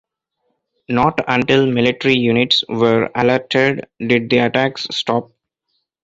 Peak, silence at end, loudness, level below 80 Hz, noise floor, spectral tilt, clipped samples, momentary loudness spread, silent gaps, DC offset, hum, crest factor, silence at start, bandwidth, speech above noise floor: 0 dBFS; 0.8 s; -16 LUFS; -52 dBFS; -71 dBFS; -5.5 dB/octave; under 0.1%; 6 LU; none; under 0.1%; none; 16 dB; 0.9 s; 7.8 kHz; 55 dB